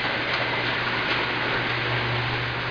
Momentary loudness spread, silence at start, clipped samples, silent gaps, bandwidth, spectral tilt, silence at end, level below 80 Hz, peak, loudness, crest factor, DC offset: 1 LU; 0 s; under 0.1%; none; 5.4 kHz; -5.5 dB/octave; 0 s; -48 dBFS; -12 dBFS; -24 LUFS; 12 dB; under 0.1%